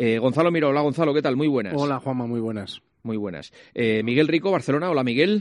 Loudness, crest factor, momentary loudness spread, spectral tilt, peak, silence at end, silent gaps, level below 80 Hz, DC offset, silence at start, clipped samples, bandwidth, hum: -22 LUFS; 16 dB; 13 LU; -7 dB/octave; -6 dBFS; 0 s; none; -66 dBFS; under 0.1%; 0 s; under 0.1%; 11.5 kHz; none